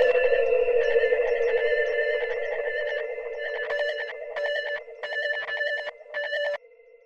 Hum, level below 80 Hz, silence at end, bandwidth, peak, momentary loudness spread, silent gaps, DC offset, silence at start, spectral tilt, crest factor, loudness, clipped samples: none; -56 dBFS; 0.5 s; 6.8 kHz; -10 dBFS; 10 LU; none; under 0.1%; 0 s; -2 dB/octave; 16 dB; -26 LUFS; under 0.1%